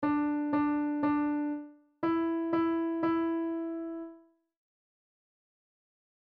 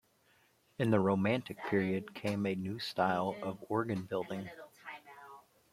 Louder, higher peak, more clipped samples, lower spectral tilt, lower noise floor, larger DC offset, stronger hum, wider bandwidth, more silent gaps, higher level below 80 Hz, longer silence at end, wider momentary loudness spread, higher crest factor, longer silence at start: first, -31 LUFS vs -35 LUFS; second, -18 dBFS vs -14 dBFS; neither; first, -9 dB/octave vs -7 dB/octave; second, -57 dBFS vs -70 dBFS; neither; neither; second, 4.7 kHz vs 14.5 kHz; neither; first, -68 dBFS vs -74 dBFS; first, 2.1 s vs 0.35 s; second, 11 LU vs 20 LU; second, 14 dB vs 22 dB; second, 0 s vs 0.8 s